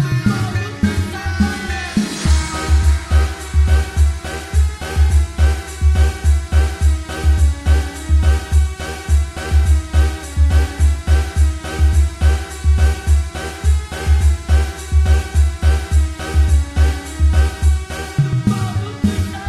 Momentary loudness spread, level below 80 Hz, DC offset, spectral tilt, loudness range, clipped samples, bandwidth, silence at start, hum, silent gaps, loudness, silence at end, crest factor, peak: 4 LU; -16 dBFS; under 0.1%; -6 dB/octave; 1 LU; under 0.1%; 12.5 kHz; 0 s; none; none; -17 LUFS; 0 s; 12 dB; -2 dBFS